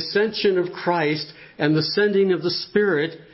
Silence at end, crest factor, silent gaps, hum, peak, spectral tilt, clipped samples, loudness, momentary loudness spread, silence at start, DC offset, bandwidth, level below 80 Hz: 0.1 s; 16 dB; none; none; -6 dBFS; -9 dB/octave; under 0.1%; -21 LUFS; 5 LU; 0 s; under 0.1%; 5.8 kHz; -64 dBFS